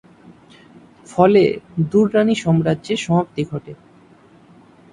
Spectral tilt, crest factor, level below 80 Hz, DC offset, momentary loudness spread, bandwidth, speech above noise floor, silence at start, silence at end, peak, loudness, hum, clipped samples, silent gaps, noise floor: -7 dB/octave; 18 dB; -54 dBFS; under 0.1%; 13 LU; 10.5 kHz; 32 dB; 1.1 s; 1.2 s; 0 dBFS; -17 LUFS; none; under 0.1%; none; -49 dBFS